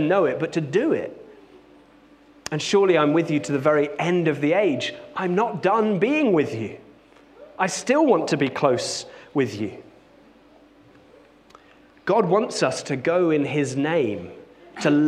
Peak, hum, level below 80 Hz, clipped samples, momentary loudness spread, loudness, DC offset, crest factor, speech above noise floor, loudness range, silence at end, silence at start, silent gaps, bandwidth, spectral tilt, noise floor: -6 dBFS; none; -66 dBFS; under 0.1%; 12 LU; -22 LUFS; under 0.1%; 18 dB; 31 dB; 6 LU; 0 s; 0 s; none; 12 kHz; -5.5 dB/octave; -52 dBFS